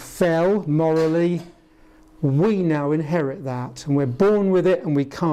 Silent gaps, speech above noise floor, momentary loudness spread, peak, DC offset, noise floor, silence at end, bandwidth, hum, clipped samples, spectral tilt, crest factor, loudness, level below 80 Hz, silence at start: none; 31 dB; 8 LU; -8 dBFS; under 0.1%; -51 dBFS; 0 s; 14.5 kHz; none; under 0.1%; -8 dB/octave; 14 dB; -21 LUFS; -54 dBFS; 0 s